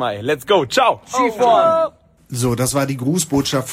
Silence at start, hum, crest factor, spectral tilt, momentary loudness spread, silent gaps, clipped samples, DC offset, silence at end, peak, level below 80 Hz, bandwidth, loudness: 0 s; none; 16 dB; -4.5 dB/octave; 8 LU; none; under 0.1%; under 0.1%; 0 s; -2 dBFS; -48 dBFS; 16.5 kHz; -17 LUFS